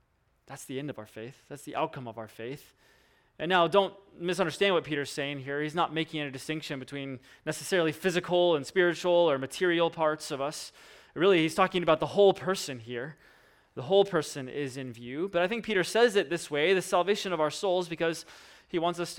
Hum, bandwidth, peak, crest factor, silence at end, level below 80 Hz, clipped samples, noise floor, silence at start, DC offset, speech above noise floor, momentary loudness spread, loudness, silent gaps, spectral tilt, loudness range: none; 17.5 kHz; -10 dBFS; 20 dB; 0 s; -66 dBFS; under 0.1%; -65 dBFS; 0.5 s; under 0.1%; 36 dB; 17 LU; -28 LUFS; none; -4.5 dB/octave; 5 LU